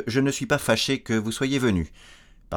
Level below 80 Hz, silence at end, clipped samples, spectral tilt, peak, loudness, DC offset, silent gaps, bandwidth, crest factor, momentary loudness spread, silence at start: -48 dBFS; 0 s; under 0.1%; -4.5 dB/octave; -6 dBFS; -24 LUFS; under 0.1%; none; 19.5 kHz; 20 dB; 5 LU; 0 s